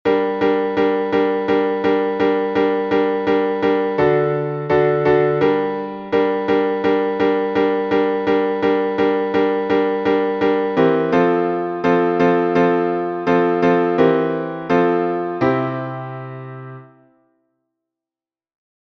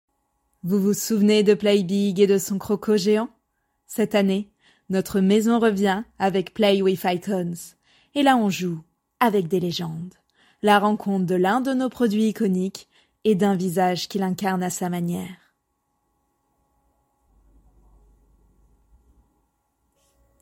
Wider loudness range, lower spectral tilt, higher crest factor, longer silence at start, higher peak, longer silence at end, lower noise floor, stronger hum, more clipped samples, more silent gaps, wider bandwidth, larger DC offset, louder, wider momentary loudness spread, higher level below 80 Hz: about the same, 5 LU vs 6 LU; first, -8 dB/octave vs -5.5 dB/octave; about the same, 14 dB vs 18 dB; second, 0.05 s vs 0.65 s; about the same, -2 dBFS vs -4 dBFS; second, 2 s vs 5.05 s; first, under -90 dBFS vs -74 dBFS; neither; neither; neither; second, 6.2 kHz vs 16.5 kHz; neither; first, -18 LUFS vs -22 LUFS; second, 6 LU vs 12 LU; first, -54 dBFS vs -62 dBFS